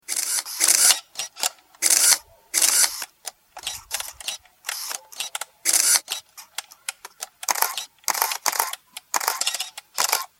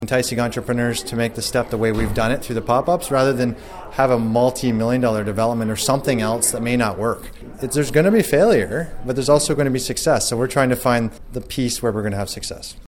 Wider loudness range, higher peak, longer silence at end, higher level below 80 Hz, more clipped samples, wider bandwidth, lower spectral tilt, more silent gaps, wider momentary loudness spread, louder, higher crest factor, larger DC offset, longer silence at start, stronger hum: first, 7 LU vs 2 LU; about the same, 0 dBFS vs -2 dBFS; about the same, 0.15 s vs 0.05 s; second, -68 dBFS vs -38 dBFS; neither; about the same, 17 kHz vs 17 kHz; second, 3.5 dB/octave vs -4.5 dB/octave; neither; first, 18 LU vs 9 LU; about the same, -21 LUFS vs -19 LUFS; first, 24 dB vs 18 dB; neither; about the same, 0.1 s vs 0 s; neither